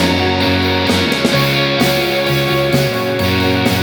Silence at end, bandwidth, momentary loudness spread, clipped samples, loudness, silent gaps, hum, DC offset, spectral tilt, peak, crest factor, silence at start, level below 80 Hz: 0 s; over 20 kHz; 2 LU; under 0.1%; -14 LUFS; none; none; under 0.1%; -5 dB/octave; 0 dBFS; 14 dB; 0 s; -38 dBFS